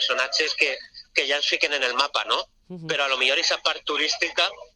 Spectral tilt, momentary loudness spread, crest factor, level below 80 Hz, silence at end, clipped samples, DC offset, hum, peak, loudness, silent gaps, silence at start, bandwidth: -0.5 dB/octave; 6 LU; 22 dB; -64 dBFS; 0.1 s; under 0.1%; under 0.1%; none; -4 dBFS; -22 LUFS; none; 0 s; 12.5 kHz